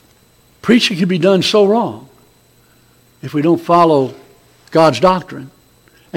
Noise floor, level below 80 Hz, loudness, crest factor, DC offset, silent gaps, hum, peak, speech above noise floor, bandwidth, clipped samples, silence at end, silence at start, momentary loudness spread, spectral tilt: -51 dBFS; -52 dBFS; -13 LUFS; 16 dB; under 0.1%; none; none; 0 dBFS; 38 dB; 16.5 kHz; under 0.1%; 0 s; 0.65 s; 15 LU; -5.5 dB/octave